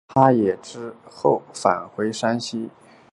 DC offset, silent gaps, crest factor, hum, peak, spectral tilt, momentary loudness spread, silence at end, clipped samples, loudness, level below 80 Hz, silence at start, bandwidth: under 0.1%; none; 22 dB; none; -2 dBFS; -6 dB/octave; 19 LU; 0.45 s; under 0.1%; -22 LUFS; -60 dBFS; 0.1 s; 11.5 kHz